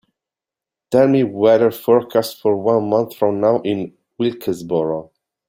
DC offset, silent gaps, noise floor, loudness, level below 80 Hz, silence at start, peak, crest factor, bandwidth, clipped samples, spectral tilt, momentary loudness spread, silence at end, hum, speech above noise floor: under 0.1%; none; -87 dBFS; -17 LUFS; -62 dBFS; 0.9 s; -2 dBFS; 16 dB; 16.5 kHz; under 0.1%; -7 dB/octave; 10 LU; 0.45 s; none; 71 dB